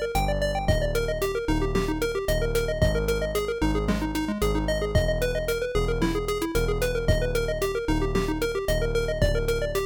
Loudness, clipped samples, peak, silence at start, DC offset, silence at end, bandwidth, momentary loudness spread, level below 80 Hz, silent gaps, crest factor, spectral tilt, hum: -26 LUFS; under 0.1%; -10 dBFS; 0 s; under 0.1%; 0 s; 19 kHz; 2 LU; -30 dBFS; none; 14 dB; -5.5 dB/octave; none